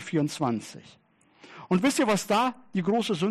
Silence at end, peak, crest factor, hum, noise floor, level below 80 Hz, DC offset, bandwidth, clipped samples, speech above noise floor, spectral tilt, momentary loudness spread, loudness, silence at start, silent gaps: 0 s; -12 dBFS; 14 dB; none; -54 dBFS; -70 dBFS; under 0.1%; 13.5 kHz; under 0.1%; 28 dB; -5 dB/octave; 10 LU; -26 LUFS; 0 s; none